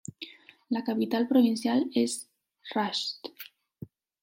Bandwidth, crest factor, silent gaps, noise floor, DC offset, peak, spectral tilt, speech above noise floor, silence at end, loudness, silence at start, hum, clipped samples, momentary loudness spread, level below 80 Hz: 16.5 kHz; 18 dB; none; -49 dBFS; under 0.1%; -12 dBFS; -4 dB/octave; 21 dB; 0.35 s; -28 LUFS; 0.2 s; none; under 0.1%; 25 LU; -76 dBFS